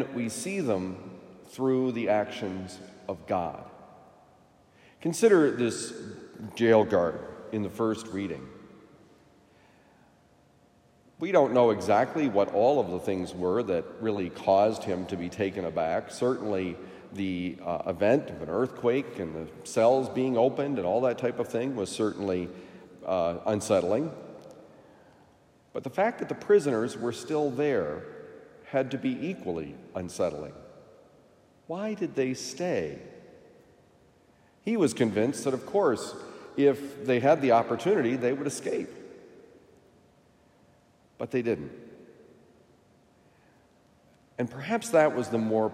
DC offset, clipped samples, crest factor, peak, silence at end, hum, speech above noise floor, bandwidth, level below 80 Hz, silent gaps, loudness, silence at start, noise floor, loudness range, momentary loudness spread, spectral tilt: under 0.1%; under 0.1%; 20 dB; -8 dBFS; 0 s; none; 34 dB; 16 kHz; -68 dBFS; none; -28 LUFS; 0 s; -62 dBFS; 11 LU; 17 LU; -5.5 dB/octave